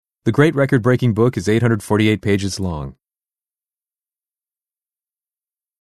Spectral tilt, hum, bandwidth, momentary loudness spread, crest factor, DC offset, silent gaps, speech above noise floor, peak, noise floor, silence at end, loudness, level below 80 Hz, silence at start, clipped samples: -6.5 dB/octave; none; 13.5 kHz; 9 LU; 18 dB; under 0.1%; none; over 74 dB; -2 dBFS; under -90 dBFS; 2.9 s; -17 LUFS; -46 dBFS; 0.25 s; under 0.1%